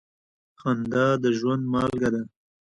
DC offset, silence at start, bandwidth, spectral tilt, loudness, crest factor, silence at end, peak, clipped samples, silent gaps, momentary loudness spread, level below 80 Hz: under 0.1%; 0.65 s; 10 kHz; -7 dB/octave; -25 LUFS; 16 dB; 0.35 s; -10 dBFS; under 0.1%; none; 10 LU; -56 dBFS